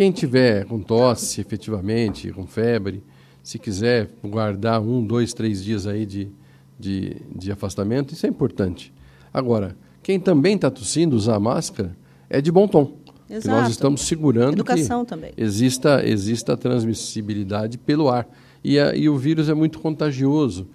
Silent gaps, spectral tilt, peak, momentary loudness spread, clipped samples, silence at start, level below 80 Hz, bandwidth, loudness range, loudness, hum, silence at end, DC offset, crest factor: none; -6 dB/octave; -2 dBFS; 13 LU; under 0.1%; 0 s; -48 dBFS; 14 kHz; 6 LU; -21 LUFS; none; 0.1 s; under 0.1%; 20 dB